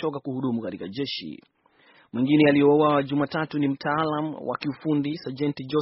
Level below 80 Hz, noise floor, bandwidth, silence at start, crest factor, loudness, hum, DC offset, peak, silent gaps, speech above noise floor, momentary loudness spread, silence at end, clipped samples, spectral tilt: -66 dBFS; -58 dBFS; 5.8 kHz; 0 s; 18 dB; -24 LUFS; none; under 0.1%; -6 dBFS; none; 34 dB; 12 LU; 0 s; under 0.1%; -5 dB/octave